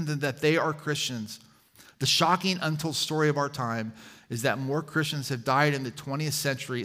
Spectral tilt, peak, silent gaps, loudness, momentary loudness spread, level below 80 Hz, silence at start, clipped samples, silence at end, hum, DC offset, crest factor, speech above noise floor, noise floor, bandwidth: -4 dB/octave; -8 dBFS; none; -27 LUFS; 10 LU; -70 dBFS; 0 s; under 0.1%; 0 s; none; under 0.1%; 20 dB; 28 dB; -56 dBFS; 16 kHz